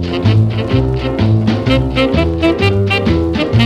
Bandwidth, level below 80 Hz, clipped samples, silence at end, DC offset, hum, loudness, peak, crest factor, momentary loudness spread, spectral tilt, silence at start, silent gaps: 8.8 kHz; -24 dBFS; under 0.1%; 0 s; under 0.1%; none; -13 LUFS; 0 dBFS; 12 dB; 2 LU; -7.5 dB/octave; 0 s; none